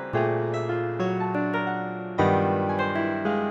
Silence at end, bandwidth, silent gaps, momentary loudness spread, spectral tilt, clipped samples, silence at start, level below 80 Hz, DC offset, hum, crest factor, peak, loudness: 0 s; 7.6 kHz; none; 5 LU; -8 dB/octave; under 0.1%; 0 s; -62 dBFS; under 0.1%; none; 16 dB; -10 dBFS; -26 LUFS